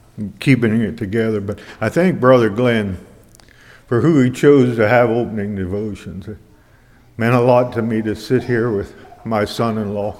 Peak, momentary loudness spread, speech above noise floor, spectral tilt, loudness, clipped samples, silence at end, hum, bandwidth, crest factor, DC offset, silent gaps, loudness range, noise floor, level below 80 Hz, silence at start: 0 dBFS; 16 LU; 33 dB; -7.5 dB/octave; -16 LUFS; under 0.1%; 0 s; none; 15 kHz; 16 dB; under 0.1%; none; 4 LU; -49 dBFS; -48 dBFS; 0.15 s